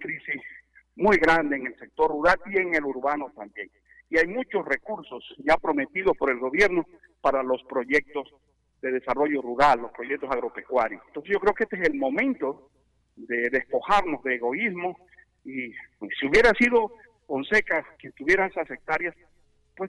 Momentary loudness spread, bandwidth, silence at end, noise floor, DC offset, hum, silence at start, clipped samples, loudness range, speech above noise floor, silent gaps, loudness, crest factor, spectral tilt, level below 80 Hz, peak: 15 LU; 11.5 kHz; 0 s; -63 dBFS; under 0.1%; none; 0 s; under 0.1%; 4 LU; 38 dB; none; -25 LUFS; 16 dB; -5 dB/octave; -50 dBFS; -10 dBFS